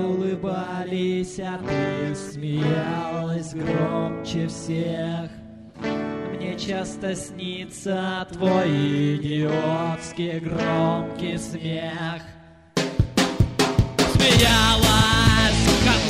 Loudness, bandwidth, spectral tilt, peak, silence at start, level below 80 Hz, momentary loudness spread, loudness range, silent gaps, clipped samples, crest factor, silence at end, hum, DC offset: -23 LUFS; 16 kHz; -4.5 dB/octave; -4 dBFS; 0 s; -36 dBFS; 13 LU; 10 LU; none; under 0.1%; 20 dB; 0 s; none; under 0.1%